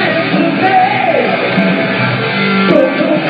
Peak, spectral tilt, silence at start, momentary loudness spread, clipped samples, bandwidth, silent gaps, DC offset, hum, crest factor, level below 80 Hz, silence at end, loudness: 0 dBFS; -8.5 dB/octave; 0 s; 3 LU; 0.1%; 5.4 kHz; none; under 0.1%; none; 12 dB; -56 dBFS; 0 s; -11 LUFS